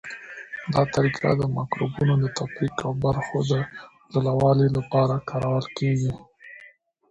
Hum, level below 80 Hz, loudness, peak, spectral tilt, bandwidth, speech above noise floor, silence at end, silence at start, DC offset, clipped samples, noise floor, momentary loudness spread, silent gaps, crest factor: none; -50 dBFS; -24 LUFS; -6 dBFS; -7 dB/octave; 8 kHz; 30 dB; 0.45 s; 0.05 s; under 0.1%; under 0.1%; -53 dBFS; 15 LU; none; 18 dB